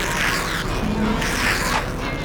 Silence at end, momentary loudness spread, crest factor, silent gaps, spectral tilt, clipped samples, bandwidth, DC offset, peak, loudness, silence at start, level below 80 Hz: 0 s; 4 LU; 14 dB; none; -3.5 dB/octave; under 0.1%; over 20 kHz; under 0.1%; -8 dBFS; -21 LUFS; 0 s; -30 dBFS